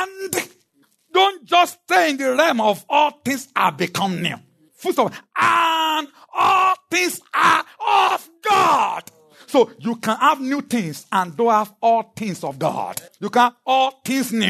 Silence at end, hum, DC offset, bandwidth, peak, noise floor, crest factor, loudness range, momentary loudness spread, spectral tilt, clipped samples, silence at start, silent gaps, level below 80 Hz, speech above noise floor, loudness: 0 s; none; under 0.1%; 13.5 kHz; -2 dBFS; -62 dBFS; 16 dB; 3 LU; 9 LU; -3.5 dB/octave; under 0.1%; 0 s; none; -74 dBFS; 42 dB; -19 LUFS